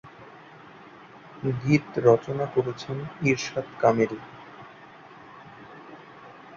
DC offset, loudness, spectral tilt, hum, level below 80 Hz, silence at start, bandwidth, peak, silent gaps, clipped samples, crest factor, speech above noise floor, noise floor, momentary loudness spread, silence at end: under 0.1%; -25 LUFS; -6.5 dB/octave; none; -62 dBFS; 0.05 s; 7.4 kHz; -6 dBFS; none; under 0.1%; 22 dB; 23 dB; -48 dBFS; 26 LU; 0 s